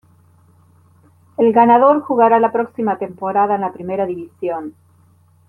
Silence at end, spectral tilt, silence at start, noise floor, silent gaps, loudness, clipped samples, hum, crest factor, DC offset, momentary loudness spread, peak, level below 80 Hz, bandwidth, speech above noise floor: 0.8 s; -9 dB/octave; 1.4 s; -52 dBFS; none; -16 LUFS; under 0.1%; none; 16 dB; under 0.1%; 14 LU; -2 dBFS; -64 dBFS; 4 kHz; 37 dB